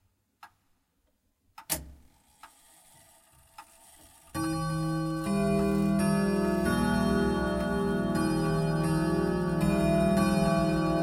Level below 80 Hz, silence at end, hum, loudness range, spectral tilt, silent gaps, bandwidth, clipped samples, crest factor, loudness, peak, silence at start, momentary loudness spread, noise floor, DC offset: -44 dBFS; 0 s; none; 15 LU; -6.5 dB/octave; none; 16.5 kHz; under 0.1%; 14 dB; -28 LUFS; -14 dBFS; 0.45 s; 6 LU; -73 dBFS; under 0.1%